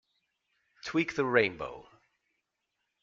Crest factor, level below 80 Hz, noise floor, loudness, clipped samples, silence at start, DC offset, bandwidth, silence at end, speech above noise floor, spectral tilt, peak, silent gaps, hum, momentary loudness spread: 24 dB; -68 dBFS; -83 dBFS; -29 LUFS; under 0.1%; 0.85 s; under 0.1%; 7.6 kHz; 1.2 s; 53 dB; -5.5 dB/octave; -10 dBFS; none; none; 17 LU